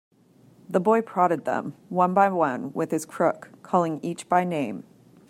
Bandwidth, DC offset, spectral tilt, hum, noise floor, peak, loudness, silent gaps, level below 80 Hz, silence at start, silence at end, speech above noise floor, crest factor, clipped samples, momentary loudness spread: 16 kHz; under 0.1%; -6.5 dB/octave; none; -56 dBFS; -6 dBFS; -25 LUFS; none; -74 dBFS; 0.7 s; 0.5 s; 32 dB; 20 dB; under 0.1%; 10 LU